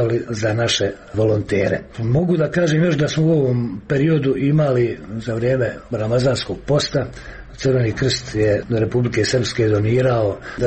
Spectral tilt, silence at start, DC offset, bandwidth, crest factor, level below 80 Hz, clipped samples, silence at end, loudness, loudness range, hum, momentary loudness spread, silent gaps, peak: -6 dB/octave; 0 s; under 0.1%; 8.8 kHz; 12 dB; -42 dBFS; under 0.1%; 0 s; -19 LUFS; 2 LU; none; 7 LU; none; -6 dBFS